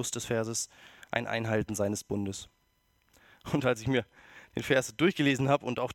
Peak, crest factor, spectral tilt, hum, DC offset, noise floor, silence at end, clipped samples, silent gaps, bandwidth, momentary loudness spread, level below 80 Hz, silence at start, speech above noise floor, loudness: -8 dBFS; 22 dB; -4.5 dB/octave; none; under 0.1%; -71 dBFS; 0 s; under 0.1%; none; 17 kHz; 13 LU; -60 dBFS; 0 s; 41 dB; -30 LUFS